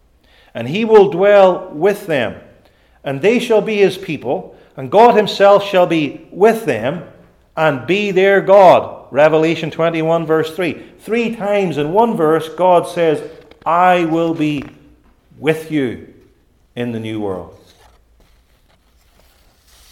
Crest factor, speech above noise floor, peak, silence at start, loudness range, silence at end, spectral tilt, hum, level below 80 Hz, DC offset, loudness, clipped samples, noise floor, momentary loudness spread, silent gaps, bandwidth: 16 dB; 40 dB; 0 dBFS; 0.55 s; 11 LU; 2.4 s; -6 dB/octave; none; -54 dBFS; under 0.1%; -14 LUFS; under 0.1%; -54 dBFS; 16 LU; none; 15.5 kHz